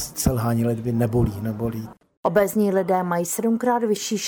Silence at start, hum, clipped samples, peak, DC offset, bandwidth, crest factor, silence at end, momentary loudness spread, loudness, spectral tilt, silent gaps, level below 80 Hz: 0 s; none; under 0.1%; -6 dBFS; under 0.1%; over 20 kHz; 16 dB; 0 s; 8 LU; -22 LUFS; -5.5 dB/octave; 2.17-2.23 s; -40 dBFS